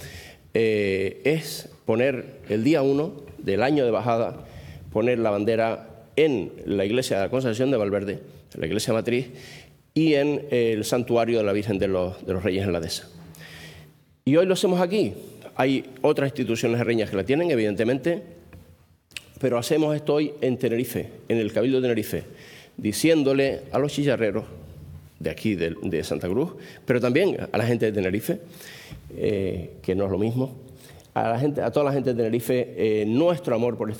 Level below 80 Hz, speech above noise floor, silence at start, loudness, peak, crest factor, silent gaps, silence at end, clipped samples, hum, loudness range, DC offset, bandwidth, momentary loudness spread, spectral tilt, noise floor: -58 dBFS; 31 dB; 0 s; -24 LUFS; -6 dBFS; 18 dB; none; 0 s; under 0.1%; none; 3 LU; under 0.1%; 19 kHz; 17 LU; -6 dB/octave; -54 dBFS